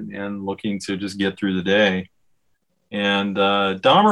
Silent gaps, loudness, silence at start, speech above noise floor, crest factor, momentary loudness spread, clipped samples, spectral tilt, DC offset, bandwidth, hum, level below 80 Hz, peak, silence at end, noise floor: none; -21 LUFS; 0 s; 51 dB; 18 dB; 11 LU; under 0.1%; -5.5 dB/octave; under 0.1%; 12 kHz; none; -64 dBFS; -2 dBFS; 0 s; -70 dBFS